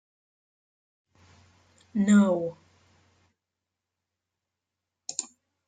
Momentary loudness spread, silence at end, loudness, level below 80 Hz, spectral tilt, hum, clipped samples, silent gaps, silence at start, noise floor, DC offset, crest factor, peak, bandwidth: 19 LU; 0.45 s; -26 LUFS; -76 dBFS; -6 dB/octave; none; under 0.1%; none; 1.95 s; -87 dBFS; under 0.1%; 22 dB; -10 dBFS; 9.4 kHz